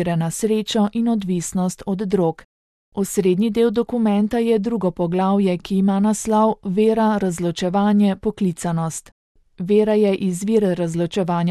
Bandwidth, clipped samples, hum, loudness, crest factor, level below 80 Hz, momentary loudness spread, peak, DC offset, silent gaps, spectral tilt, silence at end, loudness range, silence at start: 13.5 kHz; under 0.1%; none; -19 LUFS; 14 dB; -50 dBFS; 6 LU; -6 dBFS; under 0.1%; 2.44-2.92 s, 9.12-9.35 s; -6.5 dB/octave; 0 s; 2 LU; 0 s